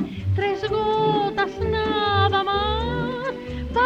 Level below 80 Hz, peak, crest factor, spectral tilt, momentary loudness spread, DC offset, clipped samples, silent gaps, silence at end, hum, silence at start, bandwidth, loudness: -36 dBFS; -8 dBFS; 14 dB; -7 dB/octave; 7 LU; under 0.1%; under 0.1%; none; 0 s; none; 0 s; 7.8 kHz; -23 LUFS